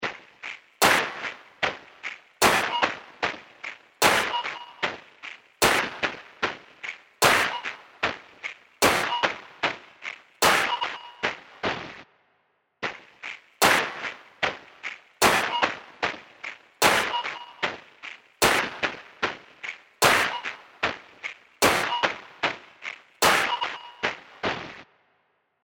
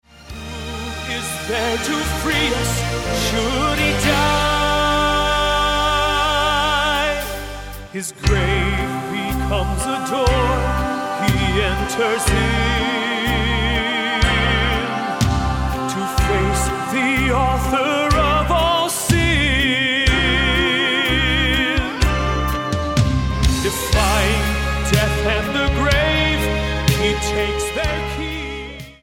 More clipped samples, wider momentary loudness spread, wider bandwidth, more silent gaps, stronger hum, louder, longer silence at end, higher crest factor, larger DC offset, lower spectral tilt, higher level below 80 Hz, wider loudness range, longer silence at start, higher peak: neither; first, 17 LU vs 7 LU; about the same, 16.5 kHz vs 17.5 kHz; neither; neither; second, -25 LUFS vs -18 LUFS; first, 0.8 s vs 0.1 s; first, 24 dB vs 18 dB; neither; second, -1.5 dB/octave vs -4 dB/octave; second, -58 dBFS vs -26 dBFS; about the same, 3 LU vs 4 LU; second, 0 s vs 0.15 s; second, -4 dBFS vs 0 dBFS